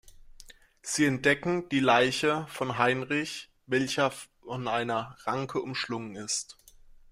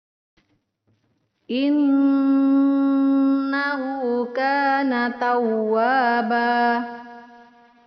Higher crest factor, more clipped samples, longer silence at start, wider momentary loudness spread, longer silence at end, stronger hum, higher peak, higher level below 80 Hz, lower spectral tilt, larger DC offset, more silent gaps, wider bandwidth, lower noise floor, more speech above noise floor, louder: first, 22 dB vs 12 dB; neither; second, 0.05 s vs 1.5 s; first, 12 LU vs 6 LU; about the same, 0.6 s vs 0.6 s; neither; about the same, -8 dBFS vs -8 dBFS; first, -62 dBFS vs -72 dBFS; first, -4 dB/octave vs -2.5 dB/octave; neither; neither; first, 16 kHz vs 5.8 kHz; second, -53 dBFS vs -68 dBFS; second, 25 dB vs 49 dB; second, -28 LUFS vs -20 LUFS